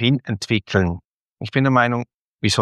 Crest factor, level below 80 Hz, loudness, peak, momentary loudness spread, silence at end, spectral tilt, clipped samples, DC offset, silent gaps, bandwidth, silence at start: 18 dB; -48 dBFS; -20 LUFS; -2 dBFS; 17 LU; 0 s; -5.5 dB/octave; under 0.1%; under 0.1%; 1.05-1.25 s, 2.14-2.38 s; 12.5 kHz; 0 s